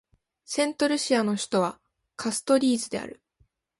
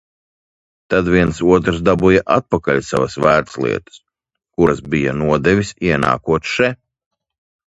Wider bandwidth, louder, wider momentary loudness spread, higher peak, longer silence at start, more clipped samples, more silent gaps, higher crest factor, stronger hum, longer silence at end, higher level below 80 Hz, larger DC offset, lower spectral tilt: about the same, 11.5 kHz vs 11 kHz; second, -26 LUFS vs -16 LUFS; first, 11 LU vs 6 LU; second, -10 dBFS vs 0 dBFS; second, 0.5 s vs 0.9 s; neither; neither; about the same, 18 dB vs 16 dB; neither; second, 0.65 s vs 1 s; second, -68 dBFS vs -38 dBFS; neither; second, -3.5 dB/octave vs -6.5 dB/octave